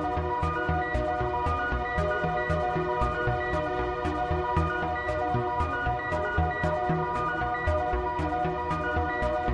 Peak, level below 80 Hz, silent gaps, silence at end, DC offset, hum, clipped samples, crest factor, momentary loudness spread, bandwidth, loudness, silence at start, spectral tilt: -12 dBFS; -38 dBFS; none; 0 s; under 0.1%; none; under 0.1%; 16 dB; 2 LU; 10 kHz; -28 LUFS; 0 s; -7.5 dB/octave